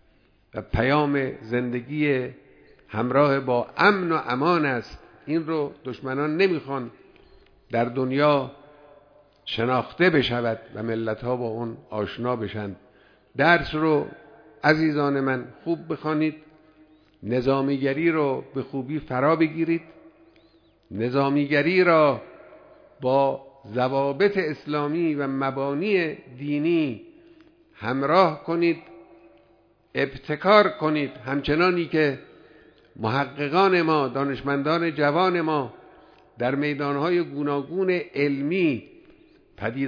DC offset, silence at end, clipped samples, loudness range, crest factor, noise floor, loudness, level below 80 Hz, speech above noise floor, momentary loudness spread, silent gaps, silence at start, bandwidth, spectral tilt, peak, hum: under 0.1%; 0 s; under 0.1%; 3 LU; 22 dB; -60 dBFS; -24 LUFS; -52 dBFS; 37 dB; 12 LU; none; 0.55 s; 5.4 kHz; -8 dB/octave; -2 dBFS; none